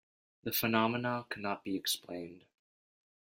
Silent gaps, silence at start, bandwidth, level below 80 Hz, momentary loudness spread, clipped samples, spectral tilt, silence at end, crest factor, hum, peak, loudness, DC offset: none; 0.45 s; 16.5 kHz; -74 dBFS; 15 LU; under 0.1%; -4 dB/octave; 0.9 s; 22 dB; none; -14 dBFS; -34 LUFS; under 0.1%